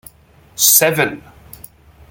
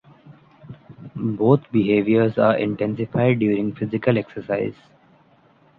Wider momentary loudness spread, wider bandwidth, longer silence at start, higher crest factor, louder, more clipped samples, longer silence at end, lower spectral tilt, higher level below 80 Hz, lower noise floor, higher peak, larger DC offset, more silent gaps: first, 25 LU vs 10 LU; first, over 20 kHz vs 4.8 kHz; first, 0.6 s vs 0.25 s; about the same, 18 dB vs 18 dB; first, -12 LUFS vs -21 LUFS; neither; second, 0.9 s vs 1.05 s; second, -1.5 dB/octave vs -10.5 dB/octave; first, -52 dBFS vs -58 dBFS; second, -48 dBFS vs -56 dBFS; about the same, 0 dBFS vs -2 dBFS; neither; neither